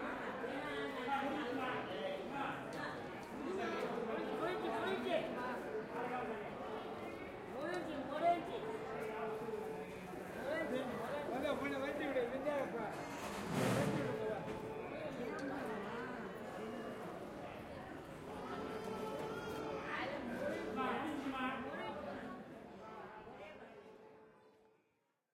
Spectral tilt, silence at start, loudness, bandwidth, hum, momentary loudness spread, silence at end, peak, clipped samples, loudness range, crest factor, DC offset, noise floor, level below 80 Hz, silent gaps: -5.5 dB/octave; 0 s; -42 LUFS; 16 kHz; none; 10 LU; 0.8 s; -24 dBFS; under 0.1%; 6 LU; 18 dB; under 0.1%; -82 dBFS; -70 dBFS; none